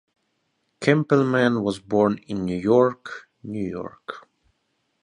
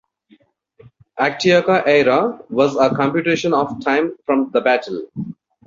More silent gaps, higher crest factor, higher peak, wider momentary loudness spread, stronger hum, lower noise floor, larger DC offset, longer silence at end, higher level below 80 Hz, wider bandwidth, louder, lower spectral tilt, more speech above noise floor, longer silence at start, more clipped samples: neither; about the same, 20 dB vs 16 dB; about the same, -2 dBFS vs -2 dBFS; first, 19 LU vs 14 LU; neither; first, -73 dBFS vs -55 dBFS; neither; first, 0.85 s vs 0.35 s; about the same, -58 dBFS vs -58 dBFS; first, 11 kHz vs 7.6 kHz; second, -22 LUFS vs -17 LUFS; first, -7 dB/octave vs -5.5 dB/octave; first, 51 dB vs 38 dB; second, 0.8 s vs 1.15 s; neither